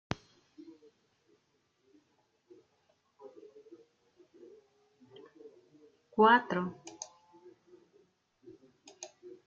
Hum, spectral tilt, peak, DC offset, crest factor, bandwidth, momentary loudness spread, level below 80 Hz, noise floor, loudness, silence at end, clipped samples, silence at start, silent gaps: none; -3 dB/octave; -12 dBFS; under 0.1%; 26 dB; 7.6 kHz; 32 LU; -74 dBFS; -76 dBFS; -29 LUFS; 0.2 s; under 0.1%; 3.25 s; none